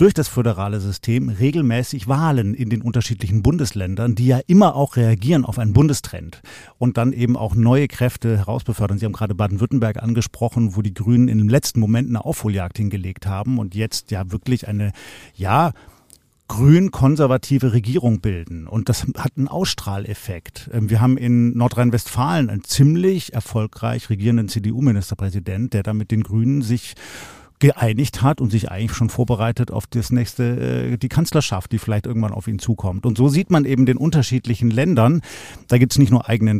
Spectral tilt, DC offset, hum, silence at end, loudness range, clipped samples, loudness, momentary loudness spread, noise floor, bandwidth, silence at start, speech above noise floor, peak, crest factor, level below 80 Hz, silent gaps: -7 dB/octave; 0.2%; none; 0 s; 4 LU; under 0.1%; -19 LUFS; 9 LU; -53 dBFS; 15.5 kHz; 0 s; 35 dB; -2 dBFS; 16 dB; -42 dBFS; none